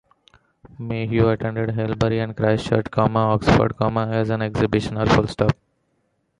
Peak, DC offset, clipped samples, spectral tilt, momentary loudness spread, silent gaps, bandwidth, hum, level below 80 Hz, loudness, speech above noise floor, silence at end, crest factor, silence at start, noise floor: -2 dBFS; under 0.1%; under 0.1%; -7.5 dB/octave; 6 LU; none; 10.5 kHz; none; -40 dBFS; -21 LUFS; 49 dB; 0.85 s; 18 dB; 0.8 s; -69 dBFS